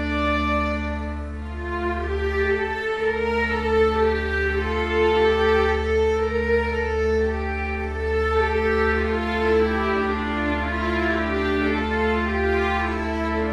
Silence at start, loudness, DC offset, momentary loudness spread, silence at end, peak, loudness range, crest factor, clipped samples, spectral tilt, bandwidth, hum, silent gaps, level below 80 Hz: 0 s; -22 LUFS; 0.1%; 6 LU; 0 s; -8 dBFS; 3 LU; 14 dB; under 0.1%; -6.5 dB/octave; 10.5 kHz; none; none; -30 dBFS